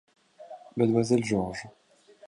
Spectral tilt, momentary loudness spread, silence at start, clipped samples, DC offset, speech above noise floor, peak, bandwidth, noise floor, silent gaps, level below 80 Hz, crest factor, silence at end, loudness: -6.5 dB/octave; 23 LU; 0.4 s; under 0.1%; under 0.1%; 22 dB; -10 dBFS; 11.5 kHz; -48 dBFS; none; -58 dBFS; 18 dB; 0.6 s; -27 LUFS